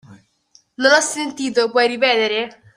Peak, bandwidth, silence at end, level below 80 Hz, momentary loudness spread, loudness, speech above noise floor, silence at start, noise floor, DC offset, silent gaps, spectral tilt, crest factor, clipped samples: -2 dBFS; 15.5 kHz; 0.25 s; -68 dBFS; 8 LU; -17 LUFS; 39 dB; 0.1 s; -56 dBFS; under 0.1%; none; -1.5 dB/octave; 18 dB; under 0.1%